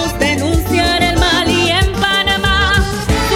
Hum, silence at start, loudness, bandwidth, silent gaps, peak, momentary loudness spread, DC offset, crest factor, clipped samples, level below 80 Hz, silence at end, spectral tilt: none; 0 s; -13 LUFS; 17 kHz; none; 0 dBFS; 3 LU; under 0.1%; 12 dB; under 0.1%; -22 dBFS; 0 s; -4 dB/octave